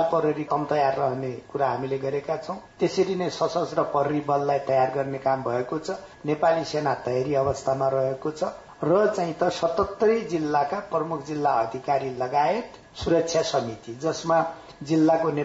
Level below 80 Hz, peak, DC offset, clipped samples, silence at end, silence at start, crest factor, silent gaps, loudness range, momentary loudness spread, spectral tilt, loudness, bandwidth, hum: -58 dBFS; -10 dBFS; under 0.1%; under 0.1%; 0 s; 0 s; 14 dB; none; 2 LU; 8 LU; -6 dB/octave; -25 LUFS; 8 kHz; none